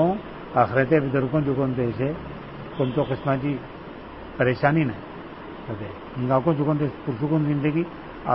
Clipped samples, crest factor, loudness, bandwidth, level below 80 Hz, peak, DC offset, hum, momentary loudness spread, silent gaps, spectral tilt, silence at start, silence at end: under 0.1%; 20 dB; -24 LUFS; 5.8 kHz; -48 dBFS; -4 dBFS; 0.1%; none; 17 LU; none; -12 dB/octave; 0 s; 0 s